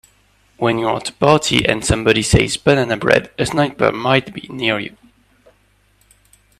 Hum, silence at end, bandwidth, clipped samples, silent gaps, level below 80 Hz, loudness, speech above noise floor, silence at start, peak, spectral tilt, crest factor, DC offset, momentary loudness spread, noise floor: 50 Hz at -45 dBFS; 1.7 s; 14.5 kHz; under 0.1%; none; -36 dBFS; -16 LUFS; 41 dB; 0.6 s; 0 dBFS; -4.5 dB/octave; 18 dB; under 0.1%; 7 LU; -57 dBFS